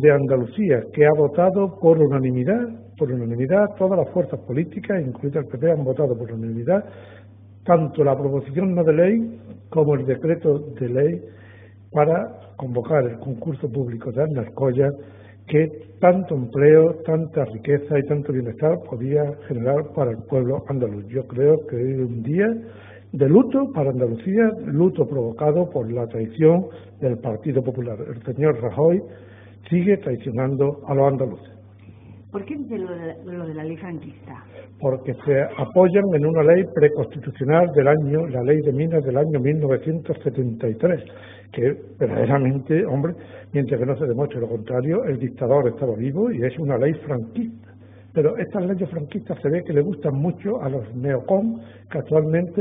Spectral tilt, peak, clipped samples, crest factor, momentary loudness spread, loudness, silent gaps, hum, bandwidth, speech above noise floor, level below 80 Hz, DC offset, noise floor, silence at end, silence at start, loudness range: -13.5 dB/octave; 0 dBFS; under 0.1%; 20 dB; 12 LU; -21 LUFS; none; none; 3.8 kHz; 24 dB; -58 dBFS; under 0.1%; -45 dBFS; 0 s; 0 s; 5 LU